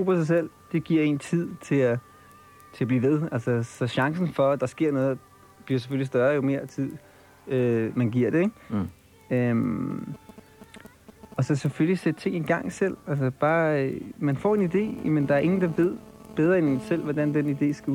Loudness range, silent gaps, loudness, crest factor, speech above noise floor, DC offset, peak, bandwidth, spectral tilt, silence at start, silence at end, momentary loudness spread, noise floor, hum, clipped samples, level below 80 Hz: 4 LU; none; -26 LUFS; 16 dB; 27 dB; under 0.1%; -10 dBFS; 16.5 kHz; -8 dB/octave; 0 s; 0 s; 8 LU; -51 dBFS; none; under 0.1%; -62 dBFS